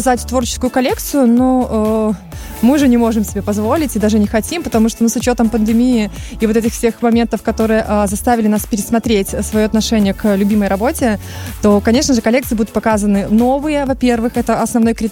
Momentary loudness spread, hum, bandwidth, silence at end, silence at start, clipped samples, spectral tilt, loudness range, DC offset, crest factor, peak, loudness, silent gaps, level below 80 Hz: 5 LU; none; 17 kHz; 0 s; 0 s; under 0.1%; -5 dB/octave; 1 LU; under 0.1%; 12 dB; -2 dBFS; -14 LUFS; none; -30 dBFS